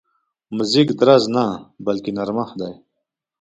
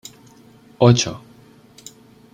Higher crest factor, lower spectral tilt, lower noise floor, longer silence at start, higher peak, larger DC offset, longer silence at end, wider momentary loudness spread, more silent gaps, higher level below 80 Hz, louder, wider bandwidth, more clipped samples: about the same, 20 dB vs 20 dB; about the same, -6 dB/octave vs -5.5 dB/octave; first, -79 dBFS vs -48 dBFS; second, 0.5 s vs 0.8 s; about the same, 0 dBFS vs -2 dBFS; neither; second, 0.65 s vs 1.15 s; second, 16 LU vs 27 LU; neither; second, -60 dBFS vs -54 dBFS; about the same, -18 LUFS vs -17 LUFS; second, 9.2 kHz vs 15 kHz; neither